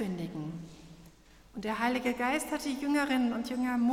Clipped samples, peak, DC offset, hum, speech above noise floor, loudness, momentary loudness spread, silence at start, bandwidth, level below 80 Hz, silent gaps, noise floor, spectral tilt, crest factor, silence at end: under 0.1%; -16 dBFS; under 0.1%; none; 26 dB; -32 LUFS; 16 LU; 0 s; 16 kHz; -60 dBFS; none; -57 dBFS; -5 dB/octave; 16 dB; 0 s